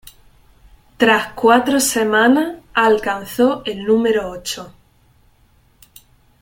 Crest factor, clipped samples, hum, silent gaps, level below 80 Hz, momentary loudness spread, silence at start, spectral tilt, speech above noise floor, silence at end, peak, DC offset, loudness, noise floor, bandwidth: 18 dB; under 0.1%; none; none; -50 dBFS; 10 LU; 1 s; -3 dB/octave; 39 dB; 1.7 s; 0 dBFS; under 0.1%; -16 LUFS; -54 dBFS; 17 kHz